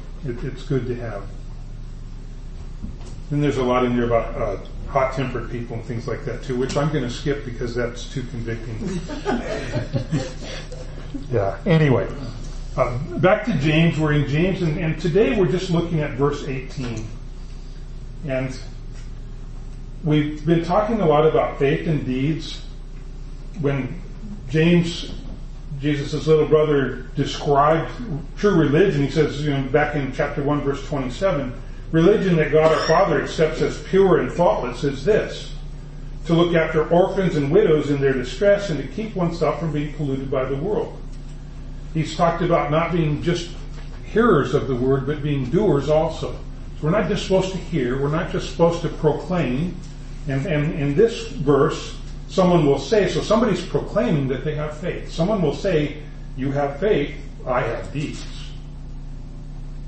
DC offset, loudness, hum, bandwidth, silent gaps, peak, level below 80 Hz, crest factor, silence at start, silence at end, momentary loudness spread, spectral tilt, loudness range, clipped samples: under 0.1%; -21 LUFS; none; 8.6 kHz; none; -4 dBFS; -34 dBFS; 18 dB; 0 s; 0 s; 20 LU; -7 dB/octave; 7 LU; under 0.1%